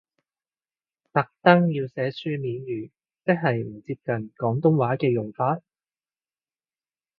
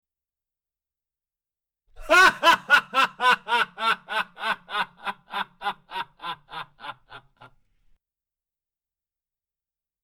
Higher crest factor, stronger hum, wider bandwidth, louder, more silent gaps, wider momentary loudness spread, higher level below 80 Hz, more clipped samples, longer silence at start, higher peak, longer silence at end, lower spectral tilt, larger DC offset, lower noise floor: about the same, 26 dB vs 22 dB; neither; second, 5.4 kHz vs 19.5 kHz; about the same, -24 LUFS vs -22 LUFS; neither; second, 14 LU vs 20 LU; second, -68 dBFS vs -56 dBFS; neither; second, 1.15 s vs 2 s; first, 0 dBFS vs -4 dBFS; second, 1.6 s vs 2.85 s; first, -10 dB/octave vs -1 dB/octave; neither; about the same, under -90 dBFS vs under -90 dBFS